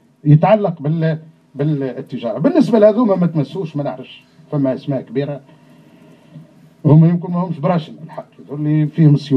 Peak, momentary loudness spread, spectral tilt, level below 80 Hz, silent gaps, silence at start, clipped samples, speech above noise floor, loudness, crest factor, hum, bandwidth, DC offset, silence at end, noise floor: 0 dBFS; 20 LU; -10 dB/octave; -60 dBFS; none; 0.25 s; under 0.1%; 30 dB; -16 LUFS; 16 dB; none; 6 kHz; under 0.1%; 0 s; -45 dBFS